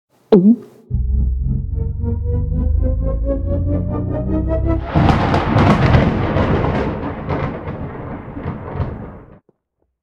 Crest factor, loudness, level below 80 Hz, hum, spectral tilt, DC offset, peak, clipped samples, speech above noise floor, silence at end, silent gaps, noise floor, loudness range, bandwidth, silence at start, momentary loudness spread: 18 dB; -18 LUFS; -24 dBFS; none; -9 dB/octave; under 0.1%; 0 dBFS; under 0.1%; 55 dB; 0.75 s; none; -69 dBFS; 6 LU; 7.4 kHz; 0.3 s; 15 LU